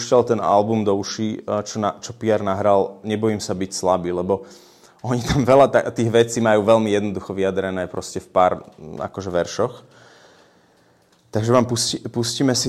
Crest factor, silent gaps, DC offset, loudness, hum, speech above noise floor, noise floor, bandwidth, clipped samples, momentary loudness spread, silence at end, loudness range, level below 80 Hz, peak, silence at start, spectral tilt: 18 dB; none; under 0.1%; -20 LUFS; none; 37 dB; -57 dBFS; 14.5 kHz; under 0.1%; 10 LU; 0 s; 7 LU; -48 dBFS; -2 dBFS; 0 s; -5 dB/octave